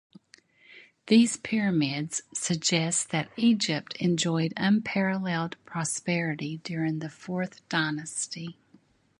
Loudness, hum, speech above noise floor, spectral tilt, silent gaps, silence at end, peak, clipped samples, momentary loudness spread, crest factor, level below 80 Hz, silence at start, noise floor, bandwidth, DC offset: -27 LUFS; none; 34 dB; -4 dB/octave; none; 0.65 s; -8 dBFS; under 0.1%; 10 LU; 20 dB; -70 dBFS; 0.75 s; -62 dBFS; 11.5 kHz; under 0.1%